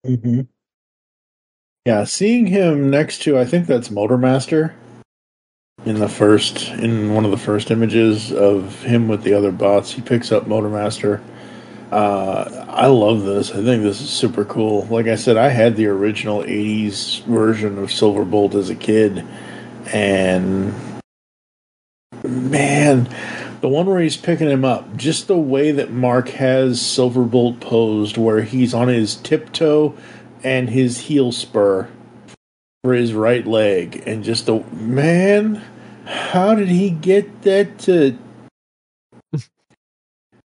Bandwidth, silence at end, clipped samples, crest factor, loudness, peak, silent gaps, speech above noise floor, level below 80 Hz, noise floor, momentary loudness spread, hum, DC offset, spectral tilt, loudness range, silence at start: 11 kHz; 1.05 s; under 0.1%; 18 dB; -17 LUFS; 0 dBFS; 0.74-1.76 s, 5.05-5.76 s, 21.04-22.10 s, 32.37-32.81 s, 38.51-39.10 s; 20 dB; -62 dBFS; -36 dBFS; 10 LU; none; under 0.1%; -6 dB/octave; 3 LU; 0.05 s